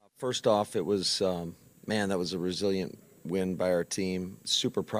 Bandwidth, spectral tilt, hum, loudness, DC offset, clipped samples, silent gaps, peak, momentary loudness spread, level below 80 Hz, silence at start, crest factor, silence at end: 15.5 kHz; -4 dB/octave; none; -30 LUFS; under 0.1%; under 0.1%; none; -12 dBFS; 9 LU; -66 dBFS; 0.2 s; 18 dB; 0 s